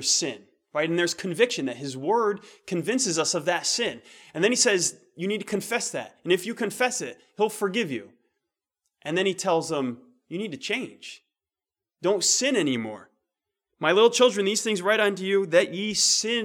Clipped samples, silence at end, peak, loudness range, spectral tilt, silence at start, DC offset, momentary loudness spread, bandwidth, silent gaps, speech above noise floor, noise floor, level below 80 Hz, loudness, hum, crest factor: under 0.1%; 0 s; -6 dBFS; 6 LU; -2.5 dB/octave; 0 s; under 0.1%; 14 LU; 18 kHz; none; over 65 dB; under -90 dBFS; -76 dBFS; -24 LUFS; none; 20 dB